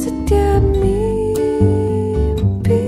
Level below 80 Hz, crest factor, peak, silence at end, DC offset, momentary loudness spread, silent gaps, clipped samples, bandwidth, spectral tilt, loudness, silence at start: -22 dBFS; 12 dB; -2 dBFS; 0 s; under 0.1%; 3 LU; none; under 0.1%; 15.5 kHz; -8 dB/octave; -16 LUFS; 0 s